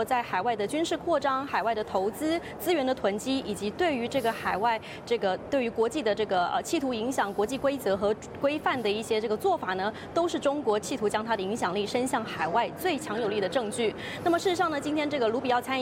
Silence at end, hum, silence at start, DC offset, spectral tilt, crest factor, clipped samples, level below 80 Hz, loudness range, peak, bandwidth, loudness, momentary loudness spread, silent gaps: 0 s; none; 0 s; under 0.1%; -4 dB/octave; 14 dB; under 0.1%; -60 dBFS; 1 LU; -14 dBFS; 16.5 kHz; -28 LUFS; 3 LU; none